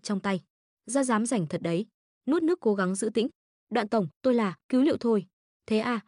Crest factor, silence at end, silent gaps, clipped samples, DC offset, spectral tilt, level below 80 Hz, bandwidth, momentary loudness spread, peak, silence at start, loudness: 14 dB; 0.05 s; 0.50-0.77 s, 1.94-2.21 s, 3.35-3.67 s, 4.16-4.21 s, 4.64-4.69 s, 5.33-5.60 s; under 0.1%; under 0.1%; -5.5 dB/octave; -74 dBFS; 11 kHz; 7 LU; -14 dBFS; 0.05 s; -28 LUFS